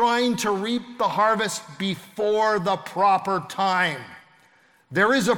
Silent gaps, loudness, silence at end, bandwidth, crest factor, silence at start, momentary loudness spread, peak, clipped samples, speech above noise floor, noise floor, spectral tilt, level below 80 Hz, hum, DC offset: none; -23 LUFS; 0 s; 18 kHz; 16 dB; 0 s; 8 LU; -6 dBFS; under 0.1%; 36 dB; -58 dBFS; -4 dB/octave; -66 dBFS; none; under 0.1%